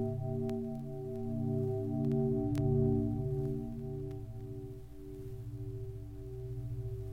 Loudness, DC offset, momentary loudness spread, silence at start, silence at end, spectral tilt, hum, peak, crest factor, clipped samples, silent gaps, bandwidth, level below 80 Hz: -37 LUFS; under 0.1%; 14 LU; 0 s; 0 s; -10.5 dB/octave; none; -18 dBFS; 18 dB; under 0.1%; none; 12.5 kHz; -50 dBFS